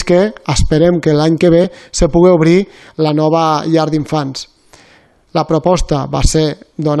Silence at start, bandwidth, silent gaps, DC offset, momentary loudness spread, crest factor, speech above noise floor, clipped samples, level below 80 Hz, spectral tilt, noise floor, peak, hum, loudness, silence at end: 0 s; 12 kHz; none; under 0.1%; 9 LU; 12 dB; 36 dB; under 0.1%; -26 dBFS; -6 dB/octave; -48 dBFS; 0 dBFS; none; -13 LUFS; 0 s